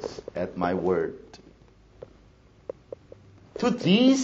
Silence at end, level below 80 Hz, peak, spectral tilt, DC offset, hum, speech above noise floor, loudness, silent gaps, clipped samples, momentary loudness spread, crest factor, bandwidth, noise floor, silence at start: 0 s; -58 dBFS; -8 dBFS; -5 dB/octave; under 0.1%; none; 32 dB; -26 LUFS; none; under 0.1%; 24 LU; 20 dB; 8 kHz; -55 dBFS; 0 s